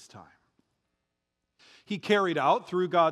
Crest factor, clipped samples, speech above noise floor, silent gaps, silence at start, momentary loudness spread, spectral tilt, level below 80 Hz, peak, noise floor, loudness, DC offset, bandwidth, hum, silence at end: 20 dB; under 0.1%; 57 dB; none; 0.15 s; 11 LU; -5.5 dB/octave; -82 dBFS; -10 dBFS; -83 dBFS; -27 LUFS; under 0.1%; 12.5 kHz; none; 0 s